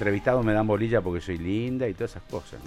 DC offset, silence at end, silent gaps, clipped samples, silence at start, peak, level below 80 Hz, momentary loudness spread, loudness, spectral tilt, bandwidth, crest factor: under 0.1%; 0 s; none; under 0.1%; 0 s; -10 dBFS; -44 dBFS; 11 LU; -26 LUFS; -8 dB/octave; 13 kHz; 16 dB